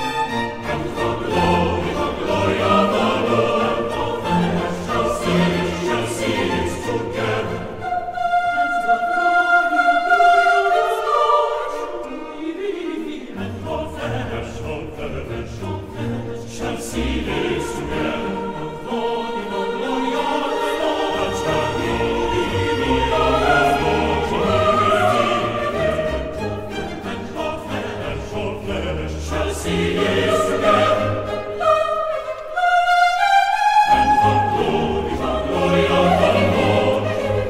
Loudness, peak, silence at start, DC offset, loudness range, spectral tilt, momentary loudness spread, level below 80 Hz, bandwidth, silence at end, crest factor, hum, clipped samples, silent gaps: -19 LUFS; -4 dBFS; 0 s; under 0.1%; 9 LU; -5.5 dB/octave; 12 LU; -38 dBFS; 16 kHz; 0 s; 16 dB; none; under 0.1%; none